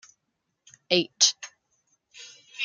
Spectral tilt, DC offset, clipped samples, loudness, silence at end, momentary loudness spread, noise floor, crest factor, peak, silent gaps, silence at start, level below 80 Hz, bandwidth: -1 dB/octave; under 0.1%; under 0.1%; -22 LUFS; 0 s; 25 LU; -79 dBFS; 26 dB; -4 dBFS; none; 0.9 s; -78 dBFS; 11 kHz